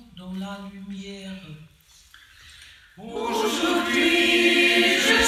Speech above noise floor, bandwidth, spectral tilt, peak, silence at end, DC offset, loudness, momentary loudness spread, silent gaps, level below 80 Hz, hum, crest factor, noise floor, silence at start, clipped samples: 28 dB; 15.5 kHz; -2.5 dB/octave; -6 dBFS; 0 s; under 0.1%; -19 LUFS; 21 LU; none; -52 dBFS; none; 18 dB; -53 dBFS; 0.15 s; under 0.1%